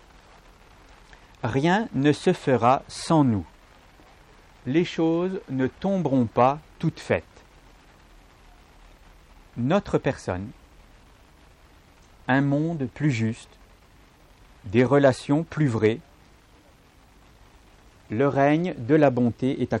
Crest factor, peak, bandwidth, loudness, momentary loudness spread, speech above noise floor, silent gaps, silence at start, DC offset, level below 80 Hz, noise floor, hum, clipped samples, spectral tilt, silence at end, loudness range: 18 dB; -8 dBFS; 11.5 kHz; -24 LUFS; 11 LU; 32 dB; none; 1.45 s; under 0.1%; -54 dBFS; -55 dBFS; none; under 0.1%; -7 dB/octave; 0 s; 7 LU